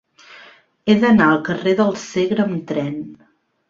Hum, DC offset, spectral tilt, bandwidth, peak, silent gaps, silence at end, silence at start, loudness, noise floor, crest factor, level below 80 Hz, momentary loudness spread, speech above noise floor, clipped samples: none; under 0.1%; -6.5 dB/octave; 7.6 kHz; -2 dBFS; none; 0.55 s; 0.3 s; -17 LUFS; -46 dBFS; 16 dB; -56 dBFS; 14 LU; 30 dB; under 0.1%